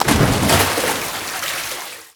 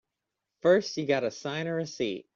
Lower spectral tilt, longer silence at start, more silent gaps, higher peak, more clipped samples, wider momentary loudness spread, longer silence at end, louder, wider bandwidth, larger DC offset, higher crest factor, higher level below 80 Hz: second, -3.5 dB/octave vs -5 dB/octave; second, 0 s vs 0.65 s; neither; first, 0 dBFS vs -10 dBFS; neither; about the same, 10 LU vs 9 LU; about the same, 0.1 s vs 0.15 s; first, -18 LUFS vs -28 LUFS; first, over 20 kHz vs 7.4 kHz; neither; about the same, 18 dB vs 18 dB; first, -36 dBFS vs -74 dBFS